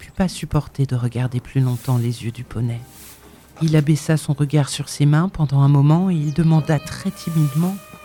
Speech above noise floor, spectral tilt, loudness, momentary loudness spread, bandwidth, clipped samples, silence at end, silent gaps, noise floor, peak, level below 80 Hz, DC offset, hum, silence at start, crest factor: 26 dB; -7 dB/octave; -19 LUFS; 10 LU; 18 kHz; under 0.1%; 0 s; none; -44 dBFS; -4 dBFS; -44 dBFS; under 0.1%; none; 0 s; 14 dB